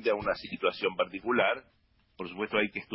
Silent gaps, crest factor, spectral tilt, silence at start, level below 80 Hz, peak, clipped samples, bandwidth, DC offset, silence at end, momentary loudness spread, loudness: none; 18 dB; -8.5 dB/octave; 0 s; -62 dBFS; -14 dBFS; under 0.1%; 5.8 kHz; under 0.1%; 0 s; 10 LU; -30 LUFS